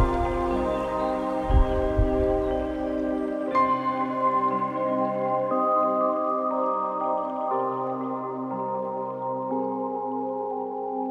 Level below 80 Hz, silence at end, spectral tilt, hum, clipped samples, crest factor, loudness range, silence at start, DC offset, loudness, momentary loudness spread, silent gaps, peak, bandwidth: -34 dBFS; 0 s; -8.5 dB/octave; none; under 0.1%; 16 dB; 5 LU; 0 s; under 0.1%; -26 LUFS; 7 LU; none; -8 dBFS; 10 kHz